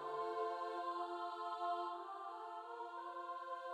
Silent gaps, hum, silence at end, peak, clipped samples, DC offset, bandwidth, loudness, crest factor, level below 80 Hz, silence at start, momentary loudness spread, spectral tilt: none; none; 0 s; -32 dBFS; under 0.1%; under 0.1%; 12.5 kHz; -45 LUFS; 14 dB; under -90 dBFS; 0 s; 7 LU; -3.5 dB/octave